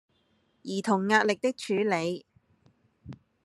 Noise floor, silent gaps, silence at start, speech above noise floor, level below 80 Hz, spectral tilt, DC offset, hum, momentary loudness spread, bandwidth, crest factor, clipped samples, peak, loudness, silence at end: -70 dBFS; none; 0.65 s; 43 dB; -70 dBFS; -5 dB/octave; under 0.1%; none; 25 LU; 12.5 kHz; 22 dB; under 0.1%; -8 dBFS; -27 LUFS; 0.3 s